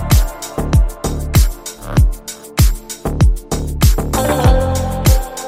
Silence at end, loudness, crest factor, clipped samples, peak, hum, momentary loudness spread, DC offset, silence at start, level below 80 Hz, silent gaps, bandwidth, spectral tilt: 0 s; -16 LUFS; 14 dB; under 0.1%; 0 dBFS; none; 9 LU; under 0.1%; 0 s; -16 dBFS; none; 16.5 kHz; -5.5 dB/octave